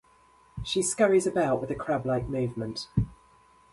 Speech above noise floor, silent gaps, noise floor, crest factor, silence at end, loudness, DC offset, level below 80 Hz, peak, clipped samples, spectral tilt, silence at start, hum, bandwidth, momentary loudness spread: 33 dB; none; -60 dBFS; 18 dB; 0.6 s; -28 LUFS; under 0.1%; -48 dBFS; -10 dBFS; under 0.1%; -5 dB/octave; 0.55 s; none; 11.5 kHz; 12 LU